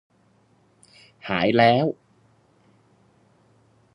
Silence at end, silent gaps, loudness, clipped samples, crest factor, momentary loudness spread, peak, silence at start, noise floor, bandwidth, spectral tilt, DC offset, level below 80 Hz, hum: 2 s; none; -20 LUFS; under 0.1%; 24 dB; 23 LU; -4 dBFS; 1.25 s; -61 dBFS; 10.5 kHz; -7.5 dB/octave; under 0.1%; -62 dBFS; none